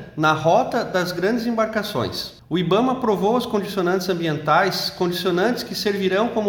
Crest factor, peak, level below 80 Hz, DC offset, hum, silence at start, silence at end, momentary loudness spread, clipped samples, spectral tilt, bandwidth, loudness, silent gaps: 16 dB; -4 dBFS; -54 dBFS; under 0.1%; none; 0 s; 0 s; 6 LU; under 0.1%; -5.5 dB/octave; 18 kHz; -21 LUFS; none